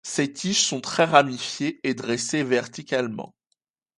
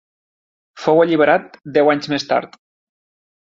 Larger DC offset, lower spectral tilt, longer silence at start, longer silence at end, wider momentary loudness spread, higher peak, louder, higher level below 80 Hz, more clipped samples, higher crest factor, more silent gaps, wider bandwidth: neither; second, -3 dB/octave vs -5.5 dB/octave; second, 0.05 s vs 0.75 s; second, 0.7 s vs 1.05 s; first, 10 LU vs 7 LU; about the same, -2 dBFS vs -2 dBFS; second, -23 LUFS vs -16 LUFS; second, -70 dBFS vs -64 dBFS; neither; first, 24 dB vs 18 dB; neither; first, 11.5 kHz vs 7.6 kHz